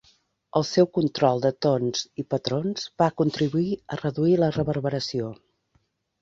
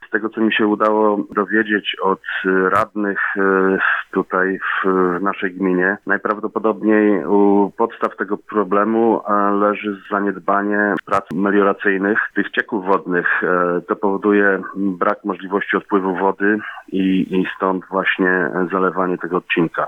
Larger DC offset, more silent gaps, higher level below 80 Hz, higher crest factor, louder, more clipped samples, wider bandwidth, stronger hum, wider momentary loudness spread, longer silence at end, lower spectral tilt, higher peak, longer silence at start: neither; neither; first, -58 dBFS vs -64 dBFS; about the same, 20 dB vs 16 dB; second, -25 LUFS vs -18 LUFS; neither; about the same, 7.8 kHz vs 7.2 kHz; neither; about the same, 8 LU vs 6 LU; first, 0.9 s vs 0 s; second, -6 dB/octave vs -7.5 dB/octave; second, -6 dBFS vs -2 dBFS; first, 0.55 s vs 0 s